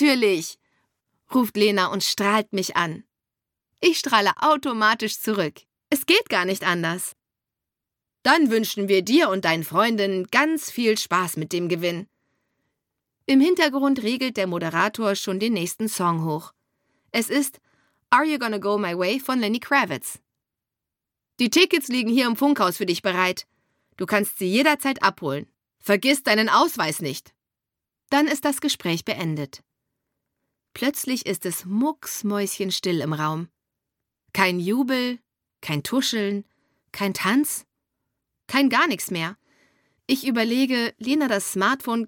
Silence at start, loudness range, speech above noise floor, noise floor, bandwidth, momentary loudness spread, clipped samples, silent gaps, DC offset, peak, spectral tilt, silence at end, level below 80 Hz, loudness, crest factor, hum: 0 s; 5 LU; 64 dB; -86 dBFS; 17.5 kHz; 10 LU; under 0.1%; none; under 0.1%; -2 dBFS; -4 dB/octave; 0 s; -72 dBFS; -22 LUFS; 22 dB; none